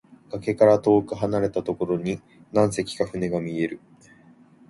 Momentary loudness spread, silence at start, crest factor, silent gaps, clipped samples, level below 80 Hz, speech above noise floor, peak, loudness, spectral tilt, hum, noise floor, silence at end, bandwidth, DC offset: 13 LU; 0.3 s; 20 dB; none; under 0.1%; -56 dBFS; 30 dB; -4 dBFS; -23 LUFS; -6.5 dB/octave; none; -53 dBFS; 0.9 s; 11.5 kHz; under 0.1%